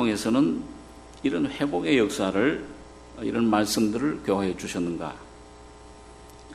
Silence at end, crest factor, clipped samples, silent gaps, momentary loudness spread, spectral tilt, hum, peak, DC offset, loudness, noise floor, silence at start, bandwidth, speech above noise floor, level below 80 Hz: 0 s; 18 dB; under 0.1%; none; 21 LU; -5 dB/octave; none; -8 dBFS; under 0.1%; -25 LUFS; -47 dBFS; 0 s; 13 kHz; 22 dB; -52 dBFS